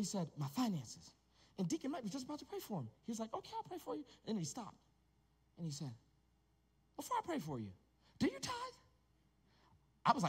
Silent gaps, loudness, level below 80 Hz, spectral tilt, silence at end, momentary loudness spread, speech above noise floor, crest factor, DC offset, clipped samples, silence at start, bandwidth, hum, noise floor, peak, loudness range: none; -44 LUFS; -74 dBFS; -5 dB/octave; 0 s; 13 LU; 33 dB; 26 dB; under 0.1%; under 0.1%; 0 s; 16 kHz; none; -76 dBFS; -18 dBFS; 4 LU